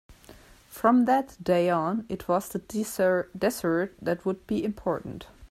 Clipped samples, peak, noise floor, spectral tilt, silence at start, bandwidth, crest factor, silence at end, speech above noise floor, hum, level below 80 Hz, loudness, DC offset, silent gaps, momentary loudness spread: under 0.1%; -8 dBFS; -52 dBFS; -6 dB/octave; 0.1 s; 16 kHz; 20 dB; 0.05 s; 26 dB; none; -56 dBFS; -27 LUFS; under 0.1%; none; 10 LU